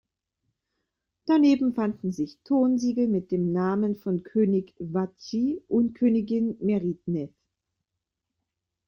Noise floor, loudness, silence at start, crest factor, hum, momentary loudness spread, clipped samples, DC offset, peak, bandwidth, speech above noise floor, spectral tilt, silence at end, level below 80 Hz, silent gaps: -85 dBFS; -26 LUFS; 1.25 s; 16 dB; none; 9 LU; under 0.1%; under 0.1%; -12 dBFS; 7 kHz; 60 dB; -8 dB/octave; 1.6 s; -66 dBFS; none